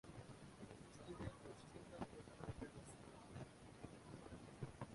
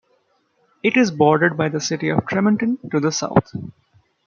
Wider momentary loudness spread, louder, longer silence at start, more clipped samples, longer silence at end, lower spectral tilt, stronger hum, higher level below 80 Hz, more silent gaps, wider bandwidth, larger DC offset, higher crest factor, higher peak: about the same, 6 LU vs 7 LU; second, -57 LUFS vs -19 LUFS; second, 0.05 s vs 0.85 s; neither; second, 0 s vs 0.55 s; about the same, -6 dB/octave vs -5.5 dB/octave; neither; second, -68 dBFS vs -56 dBFS; neither; first, 11.5 kHz vs 7.4 kHz; neither; about the same, 22 dB vs 18 dB; second, -34 dBFS vs -2 dBFS